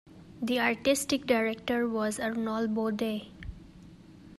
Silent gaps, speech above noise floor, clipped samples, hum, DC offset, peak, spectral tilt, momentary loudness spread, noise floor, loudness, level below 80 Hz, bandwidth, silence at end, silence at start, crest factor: none; 22 dB; under 0.1%; none; under 0.1%; -12 dBFS; -4 dB/octave; 16 LU; -51 dBFS; -30 LUFS; -56 dBFS; 14 kHz; 0.05 s; 0.05 s; 18 dB